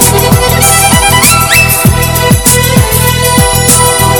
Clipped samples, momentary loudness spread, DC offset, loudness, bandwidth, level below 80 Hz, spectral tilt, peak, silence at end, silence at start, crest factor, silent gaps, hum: 4%; 3 LU; under 0.1%; -5 LUFS; over 20 kHz; -18 dBFS; -3 dB/octave; 0 dBFS; 0 s; 0 s; 6 dB; none; none